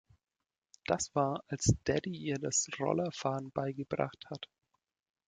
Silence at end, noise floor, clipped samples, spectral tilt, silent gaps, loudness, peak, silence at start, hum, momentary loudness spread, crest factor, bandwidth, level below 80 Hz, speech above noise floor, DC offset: 0.85 s; under -90 dBFS; under 0.1%; -4.5 dB/octave; none; -34 LUFS; -12 dBFS; 0.9 s; none; 14 LU; 24 dB; 9.8 kHz; -56 dBFS; over 56 dB; under 0.1%